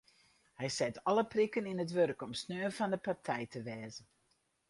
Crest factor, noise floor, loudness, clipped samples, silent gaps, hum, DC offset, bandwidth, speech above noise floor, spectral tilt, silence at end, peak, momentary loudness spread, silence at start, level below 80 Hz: 18 dB; -77 dBFS; -36 LUFS; under 0.1%; none; none; under 0.1%; 11.5 kHz; 41 dB; -5 dB/octave; 0.65 s; -18 dBFS; 11 LU; 0.6 s; -74 dBFS